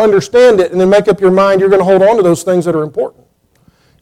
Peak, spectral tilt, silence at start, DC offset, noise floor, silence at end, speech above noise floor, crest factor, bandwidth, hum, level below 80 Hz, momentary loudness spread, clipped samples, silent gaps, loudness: 0 dBFS; -6 dB/octave; 0 s; under 0.1%; -52 dBFS; 0.95 s; 43 dB; 10 dB; 14.5 kHz; none; -48 dBFS; 8 LU; under 0.1%; none; -10 LUFS